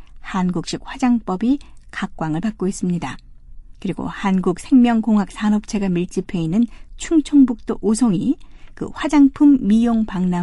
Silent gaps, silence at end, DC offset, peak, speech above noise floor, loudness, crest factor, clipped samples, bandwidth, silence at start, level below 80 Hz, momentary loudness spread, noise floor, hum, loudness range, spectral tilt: none; 0 s; under 0.1%; -4 dBFS; 20 dB; -19 LUFS; 14 dB; under 0.1%; 11.5 kHz; 0 s; -40 dBFS; 14 LU; -37 dBFS; none; 6 LU; -6.5 dB/octave